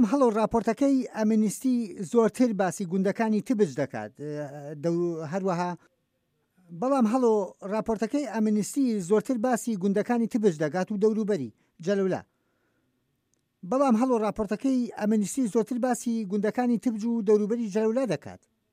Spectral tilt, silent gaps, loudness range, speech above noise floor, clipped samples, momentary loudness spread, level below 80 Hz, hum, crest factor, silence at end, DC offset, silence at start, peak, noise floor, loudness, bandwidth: -6.5 dB/octave; none; 4 LU; 49 dB; under 0.1%; 8 LU; -62 dBFS; none; 16 dB; 0.35 s; under 0.1%; 0 s; -10 dBFS; -75 dBFS; -27 LUFS; 15.5 kHz